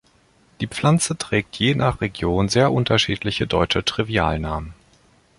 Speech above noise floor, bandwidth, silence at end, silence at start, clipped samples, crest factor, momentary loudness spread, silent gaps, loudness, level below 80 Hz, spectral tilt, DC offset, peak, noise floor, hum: 37 dB; 11.5 kHz; 0.65 s; 0.6 s; under 0.1%; 18 dB; 10 LU; none; -20 LUFS; -38 dBFS; -5 dB/octave; under 0.1%; -2 dBFS; -57 dBFS; none